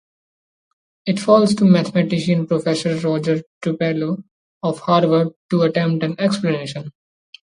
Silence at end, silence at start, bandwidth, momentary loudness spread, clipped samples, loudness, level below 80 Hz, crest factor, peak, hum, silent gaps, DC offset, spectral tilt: 0.6 s; 1.05 s; 11 kHz; 11 LU; under 0.1%; -18 LUFS; -62 dBFS; 18 dB; 0 dBFS; none; 3.46-3.61 s, 4.31-4.61 s, 5.36-5.49 s; under 0.1%; -7 dB/octave